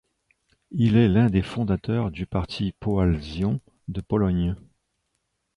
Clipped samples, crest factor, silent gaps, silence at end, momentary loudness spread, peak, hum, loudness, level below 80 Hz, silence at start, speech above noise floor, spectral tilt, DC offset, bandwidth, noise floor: under 0.1%; 16 dB; none; 0.95 s; 12 LU; -8 dBFS; none; -24 LUFS; -40 dBFS; 0.7 s; 53 dB; -8.5 dB/octave; under 0.1%; 10.5 kHz; -76 dBFS